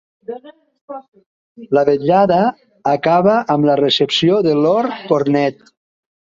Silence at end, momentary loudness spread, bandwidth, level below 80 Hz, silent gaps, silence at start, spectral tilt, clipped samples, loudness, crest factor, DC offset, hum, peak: 0.8 s; 19 LU; 7.6 kHz; -58 dBFS; 0.81-0.88 s, 1.08-1.12 s, 1.26-1.55 s; 0.3 s; -6.5 dB/octave; under 0.1%; -15 LUFS; 14 dB; under 0.1%; none; -2 dBFS